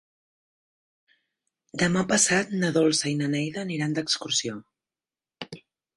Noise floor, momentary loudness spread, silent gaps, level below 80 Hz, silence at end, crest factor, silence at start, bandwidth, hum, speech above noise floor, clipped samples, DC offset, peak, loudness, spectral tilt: under -90 dBFS; 20 LU; none; -64 dBFS; 0.4 s; 22 dB; 1.75 s; 11.5 kHz; none; over 65 dB; under 0.1%; under 0.1%; -6 dBFS; -24 LUFS; -3.5 dB/octave